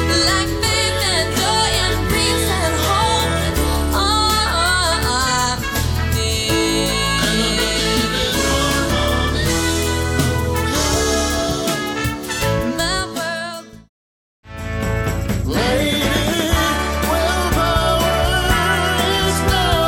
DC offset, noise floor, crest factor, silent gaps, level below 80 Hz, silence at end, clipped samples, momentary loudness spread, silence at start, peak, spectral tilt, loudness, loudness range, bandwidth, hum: under 0.1%; under -90 dBFS; 16 dB; 13.89-14.43 s; -26 dBFS; 0 s; under 0.1%; 5 LU; 0 s; -2 dBFS; -3.5 dB/octave; -17 LUFS; 5 LU; 20 kHz; none